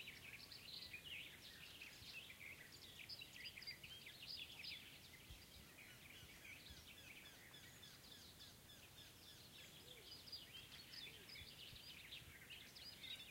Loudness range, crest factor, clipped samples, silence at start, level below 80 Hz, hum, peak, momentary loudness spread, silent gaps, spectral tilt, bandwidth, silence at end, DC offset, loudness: 5 LU; 18 dB; under 0.1%; 0 s; -76 dBFS; none; -40 dBFS; 7 LU; none; -2 dB/octave; 16 kHz; 0 s; under 0.1%; -56 LUFS